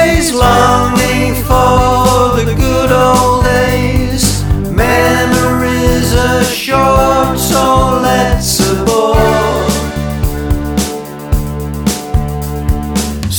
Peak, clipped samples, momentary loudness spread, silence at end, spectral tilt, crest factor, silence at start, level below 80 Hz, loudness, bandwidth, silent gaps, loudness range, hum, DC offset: 0 dBFS; under 0.1%; 8 LU; 0 s; -5 dB/octave; 10 dB; 0 s; -20 dBFS; -11 LUFS; over 20 kHz; none; 5 LU; none; under 0.1%